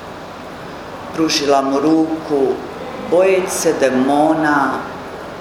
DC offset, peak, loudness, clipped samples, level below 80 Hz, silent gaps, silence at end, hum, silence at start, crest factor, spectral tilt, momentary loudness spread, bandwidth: under 0.1%; 0 dBFS; -16 LUFS; under 0.1%; -50 dBFS; none; 0 s; none; 0 s; 16 dB; -4 dB/octave; 17 LU; 16 kHz